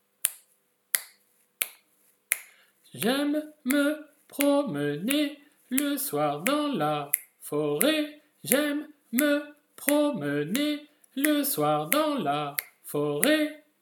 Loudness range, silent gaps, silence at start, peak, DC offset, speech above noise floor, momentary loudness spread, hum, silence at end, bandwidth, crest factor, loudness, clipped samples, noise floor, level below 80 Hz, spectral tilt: 4 LU; none; 0.25 s; 0 dBFS; under 0.1%; 43 dB; 8 LU; none; 0.25 s; 19 kHz; 28 dB; -27 LUFS; under 0.1%; -69 dBFS; -82 dBFS; -3.5 dB/octave